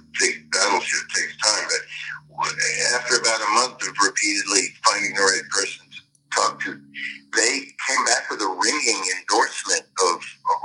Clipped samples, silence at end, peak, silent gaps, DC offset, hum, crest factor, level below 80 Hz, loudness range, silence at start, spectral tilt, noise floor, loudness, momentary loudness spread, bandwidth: under 0.1%; 0 s; -2 dBFS; none; under 0.1%; none; 20 dB; -74 dBFS; 3 LU; 0.15 s; 0.5 dB/octave; -46 dBFS; -20 LUFS; 8 LU; 11.5 kHz